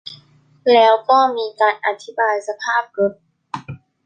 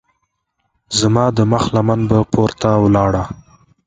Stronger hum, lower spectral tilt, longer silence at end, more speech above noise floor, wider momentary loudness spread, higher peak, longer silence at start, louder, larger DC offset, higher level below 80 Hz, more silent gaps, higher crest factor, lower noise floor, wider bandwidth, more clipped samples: neither; second, -4 dB/octave vs -6 dB/octave; second, 0.3 s vs 0.5 s; second, 35 dB vs 56 dB; first, 19 LU vs 7 LU; about the same, -2 dBFS vs 0 dBFS; second, 0.05 s vs 0.9 s; about the same, -17 LUFS vs -15 LUFS; neither; second, -64 dBFS vs -38 dBFS; neither; about the same, 16 dB vs 16 dB; second, -52 dBFS vs -70 dBFS; about the same, 9.2 kHz vs 9.4 kHz; neither